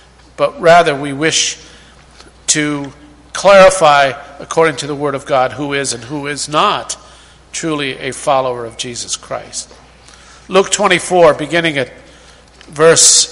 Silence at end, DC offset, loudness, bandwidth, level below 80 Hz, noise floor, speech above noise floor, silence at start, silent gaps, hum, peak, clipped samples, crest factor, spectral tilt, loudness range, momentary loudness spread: 0 s; under 0.1%; -12 LUFS; 16 kHz; -46 dBFS; -41 dBFS; 29 dB; 0.4 s; none; none; 0 dBFS; 0.2%; 14 dB; -2.5 dB/octave; 7 LU; 18 LU